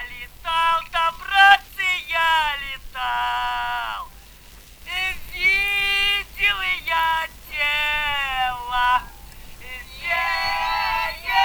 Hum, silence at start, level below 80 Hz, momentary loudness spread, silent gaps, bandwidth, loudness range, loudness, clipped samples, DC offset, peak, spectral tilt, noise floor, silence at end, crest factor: none; 0 s; -42 dBFS; 13 LU; none; over 20 kHz; 4 LU; -20 LUFS; under 0.1%; under 0.1%; 0 dBFS; -0.5 dB/octave; -45 dBFS; 0 s; 22 dB